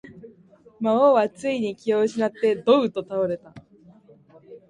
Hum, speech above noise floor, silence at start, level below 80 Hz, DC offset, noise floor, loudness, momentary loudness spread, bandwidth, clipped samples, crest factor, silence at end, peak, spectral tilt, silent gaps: none; 32 dB; 0.05 s; -68 dBFS; under 0.1%; -53 dBFS; -22 LUFS; 9 LU; 10.5 kHz; under 0.1%; 18 dB; 0.15 s; -4 dBFS; -6 dB/octave; none